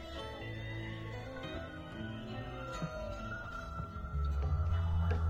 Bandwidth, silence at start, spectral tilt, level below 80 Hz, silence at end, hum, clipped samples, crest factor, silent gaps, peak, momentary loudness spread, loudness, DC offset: 7.4 kHz; 0 s; -7 dB/octave; -44 dBFS; 0 s; none; under 0.1%; 16 dB; none; -22 dBFS; 10 LU; -40 LUFS; under 0.1%